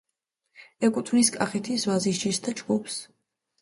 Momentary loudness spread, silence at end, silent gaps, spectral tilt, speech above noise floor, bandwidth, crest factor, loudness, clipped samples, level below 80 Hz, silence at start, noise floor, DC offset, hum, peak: 7 LU; 0.6 s; none; -4 dB/octave; 55 dB; 11.5 kHz; 20 dB; -26 LUFS; under 0.1%; -70 dBFS; 0.6 s; -81 dBFS; under 0.1%; none; -8 dBFS